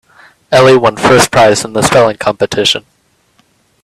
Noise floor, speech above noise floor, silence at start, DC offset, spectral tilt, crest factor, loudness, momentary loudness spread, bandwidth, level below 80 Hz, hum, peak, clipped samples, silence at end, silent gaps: -53 dBFS; 45 dB; 0.5 s; under 0.1%; -4 dB/octave; 10 dB; -9 LUFS; 7 LU; 14 kHz; -42 dBFS; none; 0 dBFS; 0.2%; 1.05 s; none